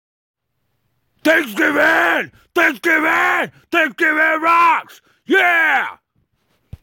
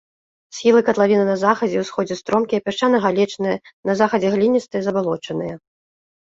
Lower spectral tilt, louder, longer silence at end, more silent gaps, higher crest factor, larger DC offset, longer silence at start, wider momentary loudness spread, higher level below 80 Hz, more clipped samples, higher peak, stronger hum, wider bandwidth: second, -3 dB/octave vs -5.5 dB/octave; first, -15 LUFS vs -19 LUFS; first, 0.9 s vs 0.75 s; second, none vs 3.73-3.83 s; about the same, 14 dB vs 18 dB; neither; first, 1.25 s vs 0.55 s; about the same, 8 LU vs 9 LU; about the same, -56 dBFS vs -60 dBFS; neither; about the same, -4 dBFS vs -2 dBFS; neither; first, 17 kHz vs 7.8 kHz